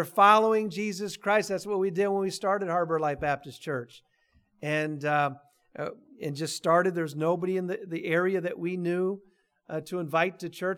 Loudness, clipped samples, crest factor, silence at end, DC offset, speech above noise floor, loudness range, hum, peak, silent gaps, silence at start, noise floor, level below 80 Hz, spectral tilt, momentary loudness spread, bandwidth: -28 LUFS; under 0.1%; 20 dB; 0 s; under 0.1%; 40 dB; 4 LU; none; -8 dBFS; none; 0 s; -67 dBFS; -66 dBFS; -5.5 dB/octave; 13 LU; 18.5 kHz